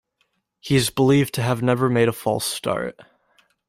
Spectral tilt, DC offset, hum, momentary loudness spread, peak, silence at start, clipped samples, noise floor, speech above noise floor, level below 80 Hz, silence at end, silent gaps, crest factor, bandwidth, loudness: -5.5 dB/octave; under 0.1%; none; 9 LU; -6 dBFS; 0.65 s; under 0.1%; -70 dBFS; 50 dB; -54 dBFS; 0.65 s; none; 16 dB; 16 kHz; -21 LUFS